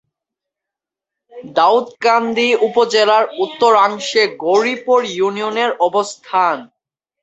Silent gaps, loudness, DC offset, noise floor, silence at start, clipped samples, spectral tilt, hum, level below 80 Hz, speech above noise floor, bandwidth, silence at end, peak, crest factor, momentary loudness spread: none; -15 LUFS; under 0.1%; -85 dBFS; 1.35 s; under 0.1%; -3 dB/octave; none; -66 dBFS; 70 dB; 8.2 kHz; 0.55 s; -2 dBFS; 14 dB; 6 LU